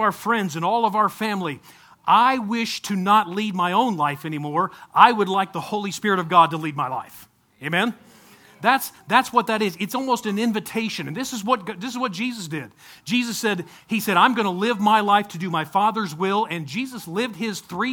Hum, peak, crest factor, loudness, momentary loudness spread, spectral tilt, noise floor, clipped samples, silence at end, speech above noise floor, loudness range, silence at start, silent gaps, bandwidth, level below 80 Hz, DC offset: none; 0 dBFS; 22 dB; -22 LUFS; 12 LU; -4.5 dB/octave; -50 dBFS; under 0.1%; 0 s; 28 dB; 5 LU; 0 s; none; 19.5 kHz; -68 dBFS; under 0.1%